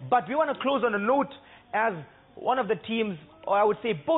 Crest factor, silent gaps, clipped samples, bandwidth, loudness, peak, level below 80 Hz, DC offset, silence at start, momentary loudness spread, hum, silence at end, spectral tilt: 14 dB; none; under 0.1%; 4.1 kHz; -27 LUFS; -12 dBFS; -66 dBFS; under 0.1%; 0 s; 9 LU; none; 0 s; -9.5 dB/octave